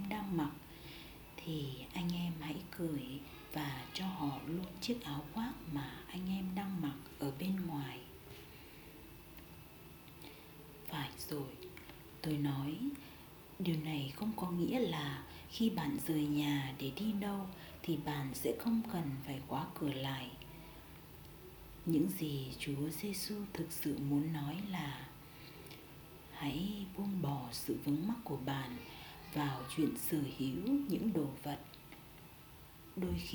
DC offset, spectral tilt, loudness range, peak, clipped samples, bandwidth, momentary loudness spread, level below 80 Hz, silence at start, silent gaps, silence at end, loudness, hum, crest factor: under 0.1%; -6 dB/octave; 6 LU; -22 dBFS; under 0.1%; over 20 kHz; 17 LU; -62 dBFS; 0 s; none; 0 s; -40 LUFS; none; 18 dB